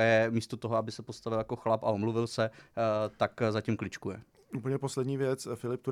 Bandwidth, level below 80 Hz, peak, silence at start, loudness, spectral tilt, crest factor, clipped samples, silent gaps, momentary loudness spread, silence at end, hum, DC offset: 14.5 kHz; -68 dBFS; -14 dBFS; 0 s; -32 LUFS; -6 dB/octave; 18 dB; under 0.1%; none; 10 LU; 0 s; none; under 0.1%